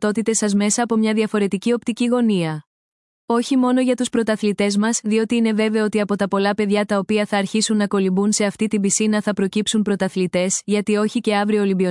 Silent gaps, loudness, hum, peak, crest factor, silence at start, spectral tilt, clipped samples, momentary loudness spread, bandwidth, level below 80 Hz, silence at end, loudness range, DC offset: 2.66-3.28 s; -19 LUFS; none; -6 dBFS; 14 dB; 0 s; -4.5 dB/octave; under 0.1%; 3 LU; 12 kHz; -62 dBFS; 0 s; 1 LU; under 0.1%